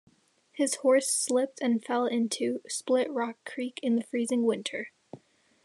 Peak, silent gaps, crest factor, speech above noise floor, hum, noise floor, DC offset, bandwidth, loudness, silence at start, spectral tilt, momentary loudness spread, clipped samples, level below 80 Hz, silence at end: -14 dBFS; none; 16 dB; 35 dB; none; -63 dBFS; under 0.1%; 13 kHz; -29 LUFS; 0.55 s; -3 dB/octave; 11 LU; under 0.1%; -88 dBFS; 0.5 s